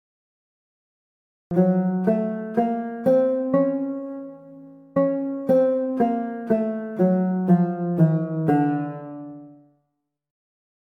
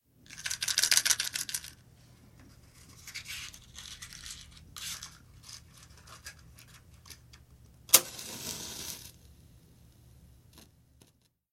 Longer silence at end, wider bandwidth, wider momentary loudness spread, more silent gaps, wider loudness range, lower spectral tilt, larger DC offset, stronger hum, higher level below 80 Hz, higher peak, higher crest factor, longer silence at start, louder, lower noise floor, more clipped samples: first, 1.45 s vs 0.9 s; second, 3.6 kHz vs 16.5 kHz; second, 12 LU vs 28 LU; neither; second, 2 LU vs 15 LU; first, -11 dB/octave vs 0.5 dB/octave; neither; neither; about the same, -66 dBFS vs -62 dBFS; second, -6 dBFS vs 0 dBFS; second, 16 dB vs 38 dB; first, 1.5 s vs 0.3 s; first, -22 LUFS vs -29 LUFS; first, -77 dBFS vs -68 dBFS; neither